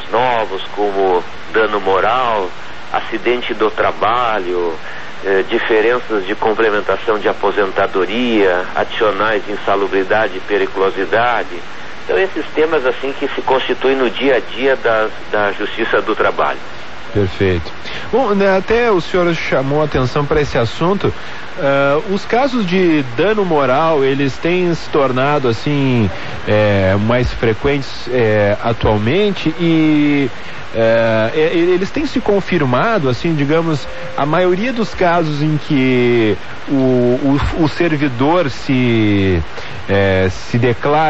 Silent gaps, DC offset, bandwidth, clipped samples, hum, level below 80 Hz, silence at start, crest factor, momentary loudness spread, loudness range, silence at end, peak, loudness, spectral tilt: none; 6%; 8.2 kHz; under 0.1%; none; -38 dBFS; 0 s; 14 dB; 7 LU; 2 LU; 0 s; 0 dBFS; -15 LUFS; -6.5 dB/octave